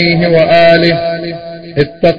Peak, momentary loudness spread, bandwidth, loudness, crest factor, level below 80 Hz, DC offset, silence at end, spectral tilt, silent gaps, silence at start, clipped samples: 0 dBFS; 15 LU; 7.4 kHz; -9 LUFS; 10 dB; -40 dBFS; under 0.1%; 0 s; -8 dB/octave; none; 0 s; 0.3%